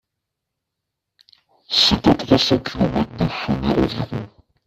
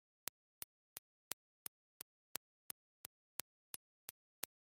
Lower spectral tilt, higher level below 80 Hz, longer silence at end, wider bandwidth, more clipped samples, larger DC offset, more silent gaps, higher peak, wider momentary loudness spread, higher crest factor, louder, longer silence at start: first, -5.5 dB/octave vs 0 dB/octave; first, -40 dBFS vs under -90 dBFS; about the same, 0.4 s vs 0.5 s; second, 14.5 kHz vs 16 kHz; neither; neither; second, none vs 0.98-4.08 s; first, 0 dBFS vs -14 dBFS; first, 13 LU vs 7 LU; second, 20 dB vs 42 dB; first, -18 LUFS vs -53 LUFS; first, 1.7 s vs 0.95 s